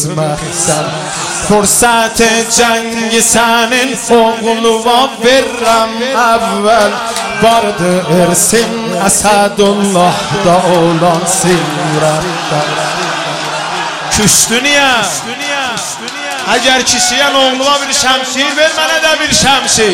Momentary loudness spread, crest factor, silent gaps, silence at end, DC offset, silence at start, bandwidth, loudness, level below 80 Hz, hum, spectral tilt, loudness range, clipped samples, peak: 8 LU; 10 dB; none; 0 s; under 0.1%; 0 s; 17 kHz; -10 LUFS; -40 dBFS; none; -2.5 dB/octave; 2 LU; under 0.1%; 0 dBFS